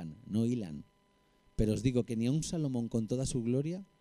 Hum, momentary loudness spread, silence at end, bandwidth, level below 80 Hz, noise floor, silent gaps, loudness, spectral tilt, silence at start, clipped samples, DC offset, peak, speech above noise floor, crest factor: none; 8 LU; 0.15 s; 12.5 kHz; -50 dBFS; -69 dBFS; none; -34 LUFS; -6.5 dB/octave; 0 s; under 0.1%; under 0.1%; -16 dBFS; 37 dB; 18 dB